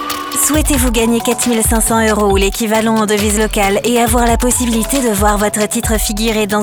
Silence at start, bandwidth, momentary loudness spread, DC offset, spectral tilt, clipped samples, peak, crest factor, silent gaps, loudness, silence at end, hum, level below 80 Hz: 0 s; over 20 kHz; 3 LU; under 0.1%; -3.5 dB/octave; under 0.1%; 0 dBFS; 12 dB; none; -13 LUFS; 0 s; none; -22 dBFS